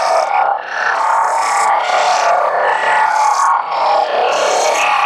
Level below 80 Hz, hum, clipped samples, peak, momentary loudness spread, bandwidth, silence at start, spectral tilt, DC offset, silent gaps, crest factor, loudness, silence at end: -64 dBFS; none; under 0.1%; -2 dBFS; 2 LU; 13.5 kHz; 0 s; 0.5 dB/octave; under 0.1%; none; 12 dB; -13 LUFS; 0 s